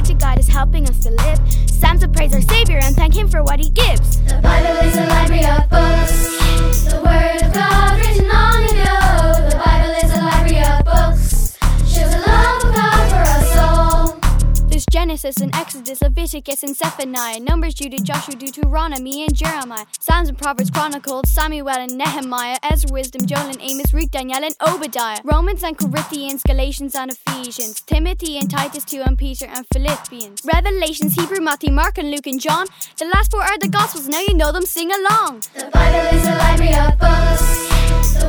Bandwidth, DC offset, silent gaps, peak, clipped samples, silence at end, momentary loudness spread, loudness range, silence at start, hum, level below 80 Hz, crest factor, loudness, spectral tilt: over 20 kHz; under 0.1%; none; 0 dBFS; under 0.1%; 0 s; 8 LU; 6 LU; 0 s; none; -16 dBFS; 14 dB; -17 LUFS; -4.5 dB/octave